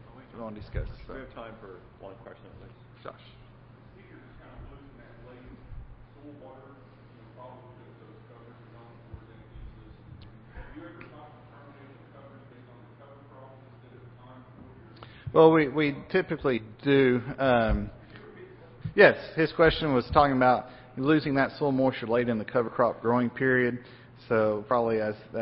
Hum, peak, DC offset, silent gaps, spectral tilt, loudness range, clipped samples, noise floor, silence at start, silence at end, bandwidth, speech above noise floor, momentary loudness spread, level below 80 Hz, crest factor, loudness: none; -4 dBFS; under 0.1%; none; -10.5 dB/octave; 25 LU; under 0.1%; -52 dBFS; 0.15 s; 0 s; 5.8 kHz; 26 dB; 27 LU; -48 dBFS; 26 dB; -25 LUFS